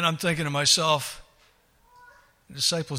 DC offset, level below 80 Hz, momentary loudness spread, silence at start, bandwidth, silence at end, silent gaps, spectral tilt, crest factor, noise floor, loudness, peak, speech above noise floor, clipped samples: under 0.1%; -60 dBFS; 20 LU; 0 s; 16 kHz; 0 s; none; -2.5 dB/octave; 20 dB; -61 dBFS; -23 LUFS; -8 dBFS; 36 dB; under 0.1%